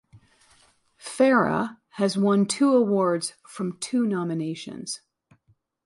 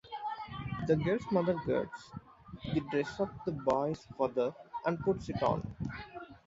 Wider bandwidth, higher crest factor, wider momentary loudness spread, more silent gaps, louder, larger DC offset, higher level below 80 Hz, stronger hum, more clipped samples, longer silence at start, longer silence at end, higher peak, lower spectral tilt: first, 11.5 kHz vs 7.8 kHz; about the same, 18 dB vs 20 dB; about the same, 15 LU vs 14 LU; neither; first, -24 LUFS vs -34 LUFS; neither; second, -68 dBFS vs -56 dBFS; neither; neither; first, 1.05 s vs 0.05 s; first, 0.9 s vs 0.1 s; first, -8 dBFS vs -16 dBFS; second, -5 dB/octave vs -7.5 dB/octave